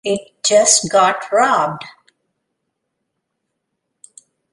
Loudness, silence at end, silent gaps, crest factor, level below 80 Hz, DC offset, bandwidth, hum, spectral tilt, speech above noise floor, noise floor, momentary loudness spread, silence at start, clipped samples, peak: -14 LUFS; 2.6 s; none; 18 dB; -62 dBFS; under 0.1%; 11.5 kHz; none; -1.5 dB/octave; 60 dB; -75 dBFS; 11 LU; 0.05 s; under 0.1%; 0 dBFS